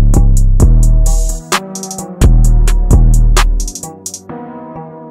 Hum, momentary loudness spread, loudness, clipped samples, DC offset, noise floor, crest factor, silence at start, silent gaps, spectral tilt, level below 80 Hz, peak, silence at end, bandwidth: none; 17 LU; -13 LUFS; under 0.1%; under 0.1%; -28 dBFS; 8 dB; 0 s; none; -5 dB/octave; -10 dBFS; 0 dBFS; 0 s; 15 kHz